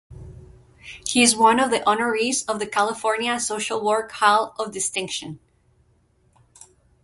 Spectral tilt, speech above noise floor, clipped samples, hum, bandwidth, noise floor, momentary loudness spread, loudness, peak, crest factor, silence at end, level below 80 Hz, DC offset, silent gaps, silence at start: -2 dB/octave; 40 dB; under 0.1%; none; 11.5 kHz; -62 dBFS; 13 LU; -21 LUFS; -4 dBFS; 20 dB; 1.65 s; -56 dBFS; under 0.1%; none; 0.1 s